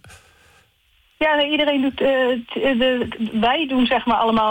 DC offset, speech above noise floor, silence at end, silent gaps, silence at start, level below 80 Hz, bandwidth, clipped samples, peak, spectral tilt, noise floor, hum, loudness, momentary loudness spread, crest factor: under 0.1%; 41 dB; 0 s; none; 0.05 s; -48 dBFS; 17 kHz; under 0.1%; -8 dBFS; -5.5 dB/octave; -60 dBFS; none; -19 LUFS; 4 LU; 10 dB